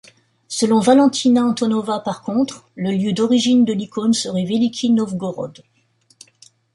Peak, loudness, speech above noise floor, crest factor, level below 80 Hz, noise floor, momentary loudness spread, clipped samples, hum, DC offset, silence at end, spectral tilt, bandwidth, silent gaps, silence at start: -2 dBFS; -18 LUFS; 42 dB; 16 dB; -62 dBFS; -59 dBFS; 12 LU; under 0.1%; none; under 0.1%; 1.25 s; -5 dB/octave; 11.5 kHz; none; 0.5 s